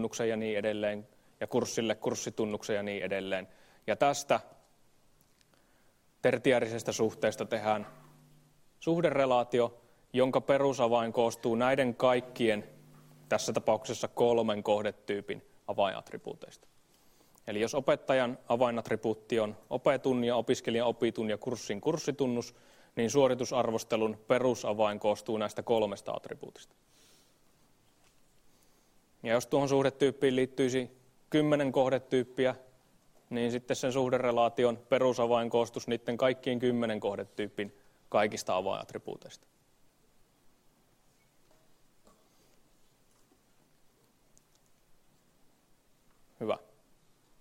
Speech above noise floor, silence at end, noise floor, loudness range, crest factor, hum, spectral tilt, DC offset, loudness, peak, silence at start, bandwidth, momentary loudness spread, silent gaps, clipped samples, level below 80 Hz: 36 dB; 0.8 s; -67 dBFS; 7 LU; 20 dB; none; -5 dB/octave; under 0.1%; -31 LUFS; -12 dBFS; 0 s; 16 kHz; 11 LU; none; under 0.1%; -70 dBFS